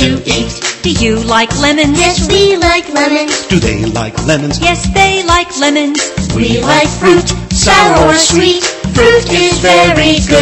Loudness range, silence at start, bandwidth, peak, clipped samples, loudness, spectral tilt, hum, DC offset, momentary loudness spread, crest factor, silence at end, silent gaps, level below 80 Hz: 3 LU; 0 s; 12.5 kHz; 0 dBFS; under 0.1%; -9 LUFS; -3.5 dB/octave; none; under 0.1%; 7 LU; 10 dB; 0 s; none; -24 dBFS